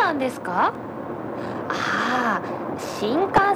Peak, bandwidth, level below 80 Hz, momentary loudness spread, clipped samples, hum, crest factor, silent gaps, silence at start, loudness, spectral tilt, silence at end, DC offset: -6 dBFS; 19.5 kHz; -54 dBFS; 10 LU; under 0.1%; none; 16 dB; none; 0 s; -24 LUFS; -5 dB/octave; 0 s; under 0.1%